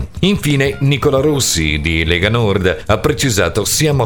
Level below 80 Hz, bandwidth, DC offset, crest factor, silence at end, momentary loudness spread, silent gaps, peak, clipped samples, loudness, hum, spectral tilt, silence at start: -30 dBFS; 19 kHz; 1%; 14 dB; 0 s; 2 LU; none; 0 dBFS; under 0.1%; -14 LUFS; none; -4.5 dB/octave; 0 s